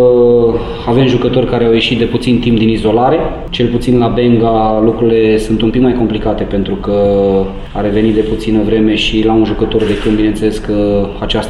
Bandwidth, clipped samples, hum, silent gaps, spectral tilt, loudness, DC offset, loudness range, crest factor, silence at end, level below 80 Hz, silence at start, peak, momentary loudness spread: 12 kHz; under 0.1%; none; none; -7 dB/octave; -12 LUFS; under 0.1%; 2 LU; 10 dB; 0 s; -24 dBFS; 0 s; 0 dBFS; 5 LU